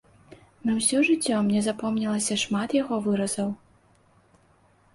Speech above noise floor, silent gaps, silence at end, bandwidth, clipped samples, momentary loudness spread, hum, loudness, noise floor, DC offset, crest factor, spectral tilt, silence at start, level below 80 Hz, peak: 36 dB; none; 1.4 s; 11.5 kHz; under 0.1%; 8 LU; none; -25 LUFS; -61 dBFS; under 0.1%; 16 dB; -4 dB/octave; 0.3 s; -64 dBFS; -10 dBFS